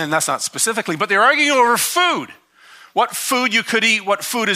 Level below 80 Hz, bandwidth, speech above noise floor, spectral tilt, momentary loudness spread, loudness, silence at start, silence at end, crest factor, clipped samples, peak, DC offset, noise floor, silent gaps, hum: -74 dBFS; 15.5 kHz; 29 dB; -1.5 dB/octave; 7 LU; -16 LUFS; 0 s; 0 s; 16 dB; under 0.1%; -2 dBFS; under 0.1%; -46 dBFS; none; none